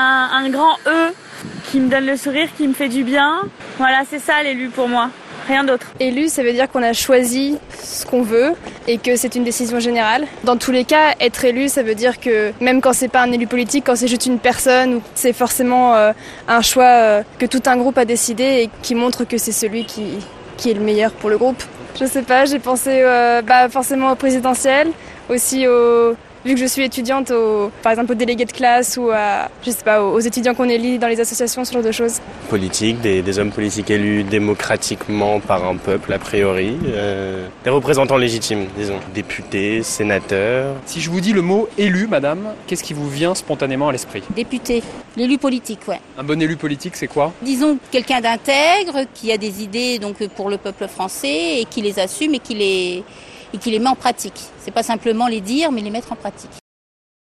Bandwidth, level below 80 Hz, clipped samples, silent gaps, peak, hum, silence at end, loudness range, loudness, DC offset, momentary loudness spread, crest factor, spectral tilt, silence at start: 14.5 kHz; -48 dBFS; under 0.1%; none; 0 dBFS; none; 0.75 s; 6 LU; -17 LUFS; under 0.1%; 11 LU; 16 dB; -3.5 dB/octave; 0 s